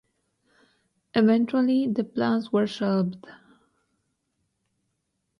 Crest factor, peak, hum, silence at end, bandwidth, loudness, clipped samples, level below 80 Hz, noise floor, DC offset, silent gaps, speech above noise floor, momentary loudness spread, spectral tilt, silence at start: 20 dB; -8 dBFS; none; 2.1 s; 10.5 kHz; -24 LUFS; under 0.1%; -70 dBFS; -77 dBFS; under 0.1%; none; 54 dB; 7 LU; -7.5 dB/octave; 1.15 s